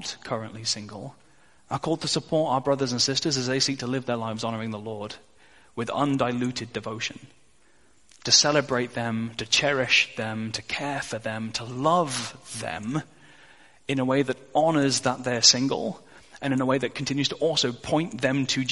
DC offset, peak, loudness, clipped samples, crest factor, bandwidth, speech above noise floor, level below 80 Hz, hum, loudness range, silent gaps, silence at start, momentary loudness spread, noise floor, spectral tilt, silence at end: 0.2%; -4 dBFS; -25 LUFS; under 0.1%; 24 dB; 11.5 kHz; 36 dB; -62 dBFS; none; 6 LU; none; 0 s; 14 LU; -62 dBFS; -3 dB/octave; 0 s